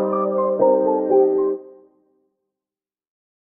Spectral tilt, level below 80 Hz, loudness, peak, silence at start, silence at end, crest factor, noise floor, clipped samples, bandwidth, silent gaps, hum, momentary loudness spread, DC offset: -11 dB/octave; -68 dBFS; -18 LUFS; -4 dBFS; 0 s; 1.85 s; 16 dB; under -90 dBFS; under 0.1%; 2.5 kHz; none; none; 6 LU; under 0.1%